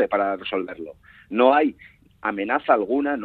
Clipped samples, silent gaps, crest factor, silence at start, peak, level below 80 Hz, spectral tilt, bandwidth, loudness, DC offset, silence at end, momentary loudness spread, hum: under 0.1%; none; 20 dB; 0 s; -2 dBFS; -62 dBFS; -7.5 dB/octave; 4.6 kHz; -22 LUFS; under 0.1%; 0 s; 14 LU; none